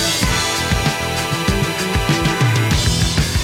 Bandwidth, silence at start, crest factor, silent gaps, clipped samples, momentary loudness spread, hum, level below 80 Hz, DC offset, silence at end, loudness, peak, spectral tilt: 16.5 kHz; 0 s; 16 dB; none; under 0.1%; 3 LU; none; -26 dBFS; under 0.1%; 0 s; -17 LUFS; -2 dBFS; -4 dB/octave